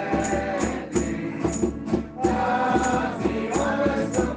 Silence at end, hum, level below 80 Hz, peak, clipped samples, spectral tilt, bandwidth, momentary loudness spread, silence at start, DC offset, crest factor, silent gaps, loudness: 0 s; none; -40 dBFS; -8 dBFS; under 0.1%; -5.5 dB/octave; 9.8 kHz; 5 LU; 0 s; under 0.1%; 16 dB; none; -25 LUFS